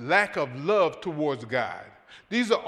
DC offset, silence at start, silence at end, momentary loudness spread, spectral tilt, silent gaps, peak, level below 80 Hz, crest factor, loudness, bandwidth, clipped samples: under 0.1%; 0 s; 0 s; 7 LU; -5 dB/octave; none; -8 dBFS; -70 dBFS; 18 dB; -27 LUFS; 12.5 kHz; under 0.1%